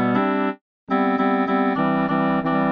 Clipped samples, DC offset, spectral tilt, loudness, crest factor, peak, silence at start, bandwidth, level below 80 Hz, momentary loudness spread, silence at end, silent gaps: under 0.1%; under 0.1%; -9.5 dB/octave; -21 LUFS; 14 dB; -8 dBFS; 0 s; 5.2 kHz; -66 dBFS; 5 LU; 0 s; 0.61-0.87 s